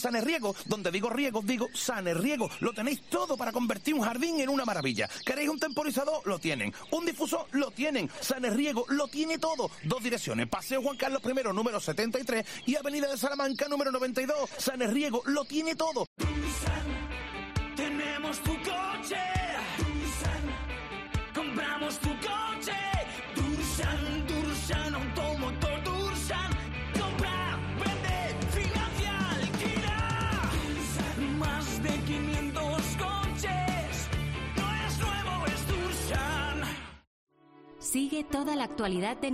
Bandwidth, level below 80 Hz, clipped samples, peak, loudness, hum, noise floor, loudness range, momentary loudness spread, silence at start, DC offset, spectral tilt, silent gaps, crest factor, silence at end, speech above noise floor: 14 kHz; -42 dBFS; under 0.1%; -16 dBFS; -32 LUFS; none; -55 dBFS; 2 LU; 3 LU; 0 s; under 0.1%; -4.5 dB/octave; 16.07-16.16 s, 37.07-37.27 s; 14 dB; 0 s; 24 dB